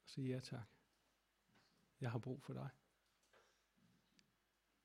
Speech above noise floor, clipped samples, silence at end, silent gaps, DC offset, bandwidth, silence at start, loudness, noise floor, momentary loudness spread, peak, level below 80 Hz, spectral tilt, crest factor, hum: 36 dB; under 0.1%; 1.45 s; none; under 0.1%; 13 kHz; 0.05 s; -50 LUFS; -84 dBFS; 9 LU; -30 dBFS; -84 dBFS; -7 dB/octave; 24 dB; none